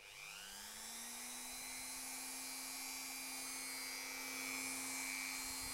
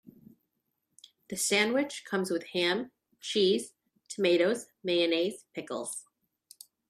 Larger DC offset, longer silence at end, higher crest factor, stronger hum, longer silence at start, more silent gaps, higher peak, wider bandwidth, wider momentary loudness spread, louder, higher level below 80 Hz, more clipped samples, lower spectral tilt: neither; second, 0 s vs 0.85 s; second, 16 dB vs 22 dB; neither; second, 0 s vs 1.3 s; neither; second, -32 dBFS vs -10 dBFS; about the same, 16 kHz vs 15 kHz; second, 7 LU vs 16 LU; second, -44 LUFS vs -29 LUFS; first, -72 dBFS vs -80 dBFS; neither; second, 0.5 dB/octave vs -3 dB/octave